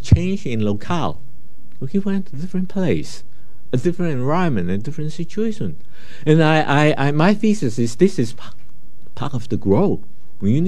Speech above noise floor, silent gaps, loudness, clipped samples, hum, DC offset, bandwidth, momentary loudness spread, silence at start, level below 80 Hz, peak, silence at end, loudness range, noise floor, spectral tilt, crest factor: 29 dB; none; -20 LUFS; under 0.1%; none; 10%; 12 kHz; 12 LU; 0.05 s; -38 dBFS; 0 dBFS; 0 s; 6 LU; -48 dBFS; -7 dB/octave; 20 dB